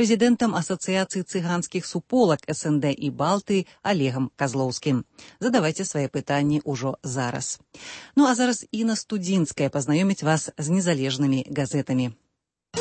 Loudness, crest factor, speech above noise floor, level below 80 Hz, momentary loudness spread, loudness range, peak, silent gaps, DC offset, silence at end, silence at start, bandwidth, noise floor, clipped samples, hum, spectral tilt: -24 LUFS; 16 dB; 54 dB; -62 dBFS; 8 LU; 2 LU; -8 dBFS; none; under 0.1%; 0 s; 0 s; 8.8 kHz; -78 dBFS; under 0.1%; none; -5 dB/octave